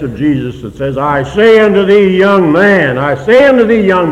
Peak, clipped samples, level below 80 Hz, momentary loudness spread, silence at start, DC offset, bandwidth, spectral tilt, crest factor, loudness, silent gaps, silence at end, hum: 0 dBFS; 1%; -38 dBFS; 9 LU; 0 s; under 0.1%; 10 kHz; -7 dB/octave; 8 dB; -8 LUFS; none; 0 s; none